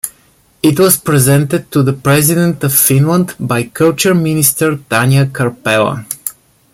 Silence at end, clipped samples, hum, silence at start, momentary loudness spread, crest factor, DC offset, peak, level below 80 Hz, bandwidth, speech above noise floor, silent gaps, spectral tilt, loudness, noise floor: 0.4 s; under 0.1%; none; 0.05 s; 8 LU; 12 dB; under 0.1%; 0 dBFS; -48 dBFS; 17.5 kHz; 39 dB; none; -5 dB/octave; -11 LUFS; -50 dBFS